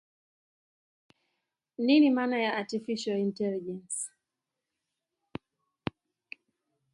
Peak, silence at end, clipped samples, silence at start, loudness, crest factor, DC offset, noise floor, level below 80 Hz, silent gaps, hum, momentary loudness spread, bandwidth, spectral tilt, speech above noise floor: -12 dBFS; 2.85 s; under 0.1%; 1.8 s; -29 LUFS; 22 dB; under 0.1%; -87 dBFS; -72 dBFS; none; none; 25 LU; 11.5 kHz; -4.5 dB/octave; 60 dB